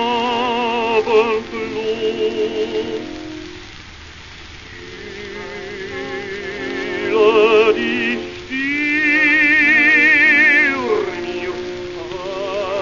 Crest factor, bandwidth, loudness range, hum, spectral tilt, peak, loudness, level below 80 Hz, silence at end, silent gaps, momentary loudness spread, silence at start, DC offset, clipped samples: 16 dB; 7.4 kHz; 17 LU; none; -4 dB/octave; -2 dBFS; -15 LUFS; -48 dBFS; 0 s; none; 23 LU; 0 s; 0.3%; under 0.1%